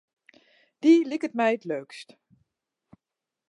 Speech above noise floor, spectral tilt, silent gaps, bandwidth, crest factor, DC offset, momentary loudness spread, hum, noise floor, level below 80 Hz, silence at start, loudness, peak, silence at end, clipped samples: 64 dB; -5.5 dB/octave; none; 10.5 kHz; 18 dB; under 0.1%; 20 LU; none; -88 dBFS; -82 dBFS; 0.85 s; -24 LUFS; -8 dBFS; 1.45 s; under 0.1%